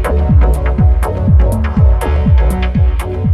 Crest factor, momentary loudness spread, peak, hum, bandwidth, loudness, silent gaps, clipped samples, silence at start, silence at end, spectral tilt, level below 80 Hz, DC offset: 10 dB; 3 LU; 0 dBFS; none; 12.5 kHz; -12 LUFS; none; under 0.1%; 0 s; 0 s; -8 dB/octave; -12 dBFS; under 0.1%